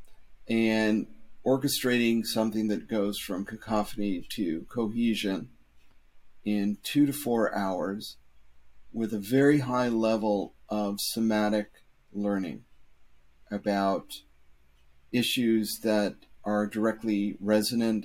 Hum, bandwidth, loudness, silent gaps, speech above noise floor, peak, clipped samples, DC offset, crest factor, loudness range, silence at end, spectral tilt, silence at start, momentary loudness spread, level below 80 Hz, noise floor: none; 16.5 kHz; -28 LUFS; none; 30 dB; -10 dBFS; under 0.1%; under 0.1%; 18 dB; 5 LU; 0 s; -5 dB/octave; 0 s; 11 LU; -58 dBFS; -58 dBFS